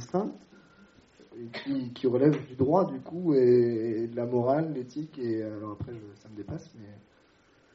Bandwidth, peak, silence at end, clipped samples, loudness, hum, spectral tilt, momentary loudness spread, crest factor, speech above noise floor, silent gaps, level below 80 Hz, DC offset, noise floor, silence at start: 6.8 kHz; -10 dBFS; 0.75 s; under 0.1%; -28 LUFS; none; -8 dB/octave; 17 LU; 20 dB; 34 dB; none; -64 dBFS; under 0.1%; -62 dBFS; 0 s